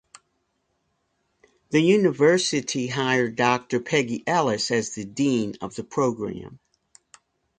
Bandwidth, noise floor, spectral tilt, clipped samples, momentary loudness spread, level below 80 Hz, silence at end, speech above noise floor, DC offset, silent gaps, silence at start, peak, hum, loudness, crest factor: 9.6 kHz; -73 dBFS; -4.5 dB/octave; under 0.1%; 12 LU; -64 dBFS; 1 s; 50 dB; under 0.1%; none; 1.7 s; -6 dBFS; none; -23 LUFS; 20 dB